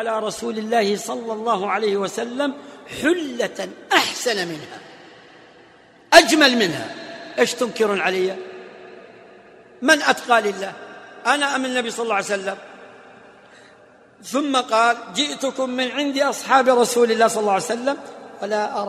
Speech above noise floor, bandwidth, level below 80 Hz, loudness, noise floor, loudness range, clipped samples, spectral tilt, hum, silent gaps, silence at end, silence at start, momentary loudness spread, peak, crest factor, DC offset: 29 dB; 16 kHz; -62 dBFS; -20 LUFS; -50 dBFS; 6 LU; under 0.1%; -2.5 dB/octave; none; none; 0 s; 0 s; 17 LU; 0 dBFS; 22 dB; under 0.1%